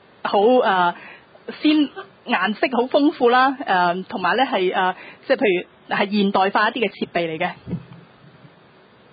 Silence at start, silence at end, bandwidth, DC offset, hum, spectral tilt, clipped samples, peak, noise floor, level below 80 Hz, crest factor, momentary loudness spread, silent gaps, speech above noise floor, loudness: 0.25 s; 1.35 s; 5 kHz; under 0.1%; none; -10 dB/octave; under 0.1%; -4 dBFS; -50 dBFS; -62 dBFS; 18 dB; 12 LU; none; 31 dB; -19 LUFS